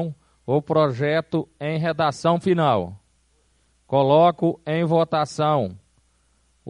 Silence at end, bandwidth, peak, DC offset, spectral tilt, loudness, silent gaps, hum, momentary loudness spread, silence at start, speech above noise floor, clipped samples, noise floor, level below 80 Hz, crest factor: 0 s; 10.5 kHz; -4 dBFS; under 0.1%; -7 dB/octave; -21 LUFS; none; none; 11 LU; 0 s; 43 dB; under 0.1%; -63 dBFS; -60 dBFS; 18 dB